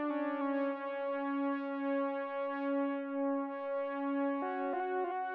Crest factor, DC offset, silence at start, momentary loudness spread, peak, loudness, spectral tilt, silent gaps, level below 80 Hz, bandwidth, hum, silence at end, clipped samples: 10 dB; under 0.1%; 0 s; 3 LU; -26 dBFS; -36 LUFS; -2 dB/octave; none; under -90 dBFS; 4.7 kHz; none; 0 s; under 0.1%